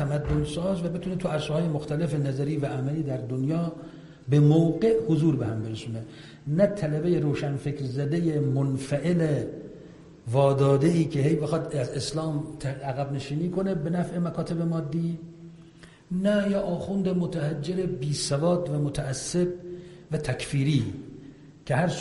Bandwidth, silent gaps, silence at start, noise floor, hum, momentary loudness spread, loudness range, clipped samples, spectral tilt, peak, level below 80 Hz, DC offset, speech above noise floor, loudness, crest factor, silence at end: 11.5 kHz; none; 0 s; -50 dBFS; none; 14 LU; 4 LU; under 0.1%; -7 dB/octave; -8 dBFS; -50 dBFS; under 0.1%; 24 dB; -27 LUFS; 18 dB; 0 s